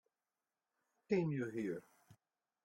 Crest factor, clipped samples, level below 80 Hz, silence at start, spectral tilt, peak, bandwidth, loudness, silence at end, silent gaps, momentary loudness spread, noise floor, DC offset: 20 dB; under 0.1%; -82 dBFS; 1.1 s; -8 dB/octave; -22 dBFS; 13 kHz; -40 LUFS; 0.5 s; none; 8 LU; under -90 dBFS; under 0.1%